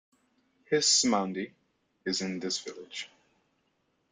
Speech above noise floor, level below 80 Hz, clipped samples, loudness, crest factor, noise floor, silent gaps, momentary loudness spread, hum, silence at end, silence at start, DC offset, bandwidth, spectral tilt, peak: 45 dB; -74 dBFS; under 0.1%; -28 LUFS; 22 dB; -75 dBFS; none; 18 LU; none; 1.05 s; 0.7 s; under 0.1%; 11.5 kHz; -2 dB/octave; -12 dBFS